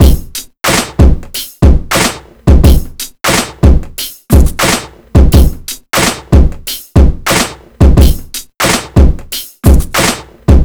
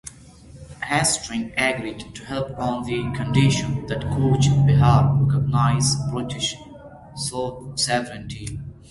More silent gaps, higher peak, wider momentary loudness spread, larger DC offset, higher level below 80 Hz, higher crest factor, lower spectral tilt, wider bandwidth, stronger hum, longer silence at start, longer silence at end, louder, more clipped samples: neither; first, 0 dBFS vs -4 dBFS; second, 11 LU vs 16 LU; neither; first, -10 dBFS vs -42 dBFS; second, 8 dB vs 18 dB; about the same, -5 dB/octave vs -5 dB/octave; first, over 20 kHz vs 11.5 kHz; neither; about the same, 0 s vs 0.05 s; second, 0 s vs 0.2 s; first, -11 LUFS vs -21 LUFS; first, 8% vs under 0.1%